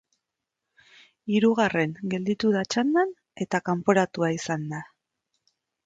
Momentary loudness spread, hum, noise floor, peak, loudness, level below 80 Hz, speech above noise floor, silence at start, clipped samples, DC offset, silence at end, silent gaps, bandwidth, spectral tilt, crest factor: 10 LU; none; -85 dBFS; -6 dBFS; -25 LUFS; -68 dBFS; 60 dB; 1.25 s; under 0.1%; under 0.1%; 1 s; none; 9 kHz; -5.5 dB/octave; 20 dB